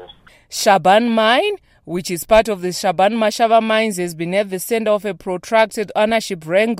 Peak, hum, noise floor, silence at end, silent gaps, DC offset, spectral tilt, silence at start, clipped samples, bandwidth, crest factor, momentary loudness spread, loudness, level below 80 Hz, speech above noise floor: -2 dBFS; none; -43 dBFS; 0 s; none; under 0.1%; -4 dB/octave; 0 s; under 0.1%; 16 kHz; 16 dB; 10 LU; -17 LUFS; -46 dBFS; 27 dB